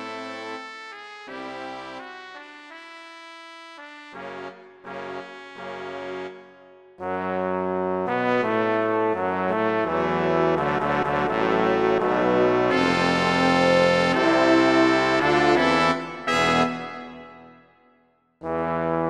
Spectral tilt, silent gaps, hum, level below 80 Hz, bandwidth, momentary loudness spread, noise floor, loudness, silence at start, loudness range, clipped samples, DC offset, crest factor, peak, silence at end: -5.5 dB/octave; none; none; -54 dBFS; 11.5 kHz; 22 LU; -63 dBFS; -21 LUFS; 0 s; 19 LU; under 0.1%; under 0.1%; 20 dB; -4 dBFS; 0 s